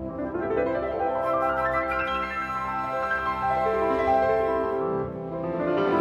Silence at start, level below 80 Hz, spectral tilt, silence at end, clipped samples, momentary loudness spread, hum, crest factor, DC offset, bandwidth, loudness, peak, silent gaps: 0 s; -48 dBFS; -7 dB/octave; 0 s; under 0.1%; 7 LU; none; 14 dB; under 0.1%; 13.5 kHz; -26 LUFS; -12 dBFS; none